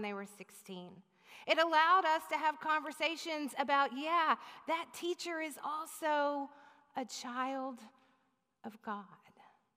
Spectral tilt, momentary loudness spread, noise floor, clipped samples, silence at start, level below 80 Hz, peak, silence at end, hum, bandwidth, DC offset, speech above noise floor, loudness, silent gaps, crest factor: -2.5 dB/octave; 20 LU; -78 dBFS; under 0.1%; 0 s; under -90 dBFS; -16 dBFS; 0.6 s; none; 15.5 kHz; under 0.1%; 42 dB; -35 LUFS; none; 20 dB